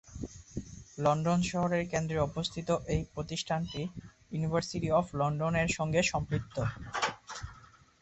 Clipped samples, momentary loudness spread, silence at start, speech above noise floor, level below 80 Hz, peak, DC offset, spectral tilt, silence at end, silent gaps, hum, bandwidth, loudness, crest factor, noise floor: under 0.1%; 15 LU; 0.05 s; 26 dB; -50 dBFS; -16 dBFS; under 0.1%; -5.5 dB/octave; 0.4 s; none; none; 8.2 kHz; -32 LUFS; 18 dB; -57 dBFS